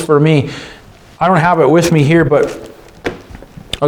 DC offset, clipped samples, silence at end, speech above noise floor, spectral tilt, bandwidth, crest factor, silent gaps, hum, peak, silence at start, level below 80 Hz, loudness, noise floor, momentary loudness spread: under 0.1%; under 0.1%; 0 s; 23 dB; -6.5 dB/octave; 16.5 kHz; 12 dB; none; none; 0 dBFS; 0 s; -40 dBFS; -11 LUFS; -34 dBFS; 19 LU